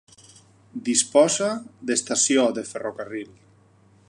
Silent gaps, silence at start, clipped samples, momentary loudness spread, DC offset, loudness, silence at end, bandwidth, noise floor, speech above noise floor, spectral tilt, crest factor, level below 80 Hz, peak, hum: none; 0.75 s; under 0.1%; 16 LU; under 0.1%; -22 LUFS; 0.85 s; 11.5 kHz; -56 dBFS; 33 dB; -2.5 dB/octave; 20 dB; -70 dBFS; -4 dBFS; none